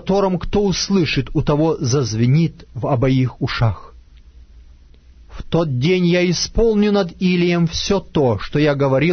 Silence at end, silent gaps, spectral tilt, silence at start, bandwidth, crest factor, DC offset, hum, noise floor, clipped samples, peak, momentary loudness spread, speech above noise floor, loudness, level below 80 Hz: 0 s; none; -6 dB/octave; 0.05 s; 6.6 kHz; 14 dB; under 0.1%; none; -45 dBFS; under 0.1%; -4 dBFS; 5 LU; 28 dB; -17 LUFS; -34 dBFS